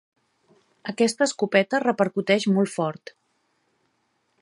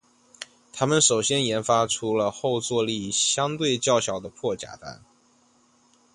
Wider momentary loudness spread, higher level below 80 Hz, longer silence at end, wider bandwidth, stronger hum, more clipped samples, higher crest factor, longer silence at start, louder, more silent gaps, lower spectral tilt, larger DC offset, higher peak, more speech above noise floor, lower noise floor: second, 13 LU vs 20 LU; second, -76 dBFS vs -62 dBFS; first, 1.5 s vs 1.2 s; about the same, 11.5 kHz vs 11.5 kHz; neither; neither; about the same, 22 dB vs 20 dB; first, 0.85 s vs 0.4 s; about the same, -23 LUFS vs -23 LUFS; neither; first, -5 dB/octave vs -3 dB/octave; neither; about the same, -4 dBFS vs -6 dBFS; first, 48 dB vs 37 dB; first, -71 dBFS vs -61 dBFS